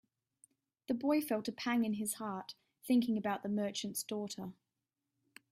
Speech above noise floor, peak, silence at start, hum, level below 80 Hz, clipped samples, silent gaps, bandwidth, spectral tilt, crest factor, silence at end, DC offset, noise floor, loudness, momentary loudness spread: 54 dB; -22 dBFS; 0.9 s; none; -80 dBFS; under 0.1%; none; 16 kHz; -4.5 dB/octave; 16 dB; 1 s; under 0.1%; -89 dBFS; -36 LUFS; 14 LU